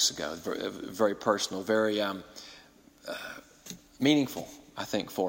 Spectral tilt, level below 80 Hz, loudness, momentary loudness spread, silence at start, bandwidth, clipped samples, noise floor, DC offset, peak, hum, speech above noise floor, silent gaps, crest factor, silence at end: -3.5 dB/octave; -66 dBFS; -30 LUFS; 20 LU; 0 s; 16.5 kHz; under 0.1%; -56 dBFS; under 0.1%; -12 dBFS; none; 26 dB; none; 20 dB; 0 s